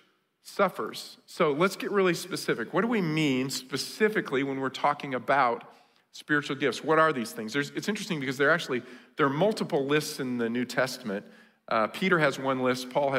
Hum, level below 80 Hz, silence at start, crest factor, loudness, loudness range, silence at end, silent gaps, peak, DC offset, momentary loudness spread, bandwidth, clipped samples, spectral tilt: none; -76 dBFS; 0.45 s; 18 dB; -28 LUFS; 1 LU; 0 s; none; -10 dBFS; under 0.1%; 9 LU; 16 kHz; under 0.1%; -5 dB/octave